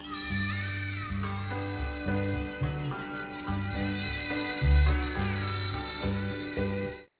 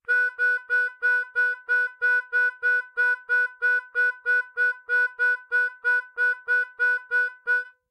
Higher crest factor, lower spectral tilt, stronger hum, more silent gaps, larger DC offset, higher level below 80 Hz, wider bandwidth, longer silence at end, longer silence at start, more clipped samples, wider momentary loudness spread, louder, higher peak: first, 16 dB vs 10 dB; first, -10 dB/octave vs 2 dB/octave; neither; neither; neither; first, -36 dBFS vs -84 dBFS; second, 4 kHz vs 10.5 kHz; about the same, 0.15 s vs 0.2 s; about the same, 0 s vs 0.1 s; neither; first, 8 LU vs 3 LU; second, -32 LUFS vs -23 LUFS; about the same, -14 dBFS vs -14 dBFS